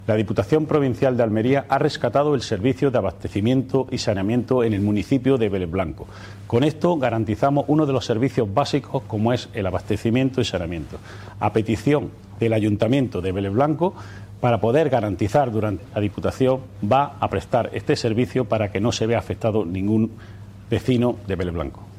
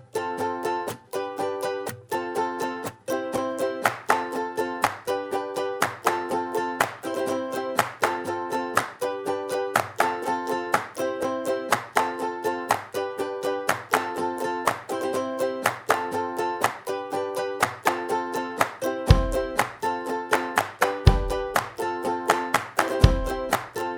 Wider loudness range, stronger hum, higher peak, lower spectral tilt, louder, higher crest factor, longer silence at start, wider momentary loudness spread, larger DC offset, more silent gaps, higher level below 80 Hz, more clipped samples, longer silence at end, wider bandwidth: about the same, 2 LU vs 3 LU; neither; second, -6 dBFS vs 0 dBFS; first, -7 dB/octave vs -5 dB/octave; first, -22 LUFS vs -26 LUFS; second, 16 dB vs 26 dB; about the same, 0 s vs 0 s; about the same, 7 LU vs 7 LU; neither; neither; second, -46 dBFS vs -36 dBFS; neither; about the same, 0 s vs 0 s; second, 13.5 kHz vs over 20 kHz